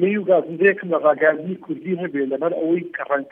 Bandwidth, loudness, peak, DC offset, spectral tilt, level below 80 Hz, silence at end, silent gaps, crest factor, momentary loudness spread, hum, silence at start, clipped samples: 3.7 kHz; -20 LUFS; -2 dBFS; under 0.1%; -10 dB/octave; -76 dBFS; 0 s; none; 18 dB; 10 LU; none; 0 s; under 0.1%